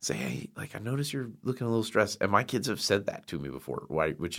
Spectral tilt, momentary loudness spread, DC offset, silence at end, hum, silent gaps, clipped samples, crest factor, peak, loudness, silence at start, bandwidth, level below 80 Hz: -4.5 dB/octave; 11 LU; under 0.1%; 0 s; none; none; under 0.1%; 24 dB; -8 dBFS; -31 LUFS; 0 s; 16.5 kHz; -62 dBFS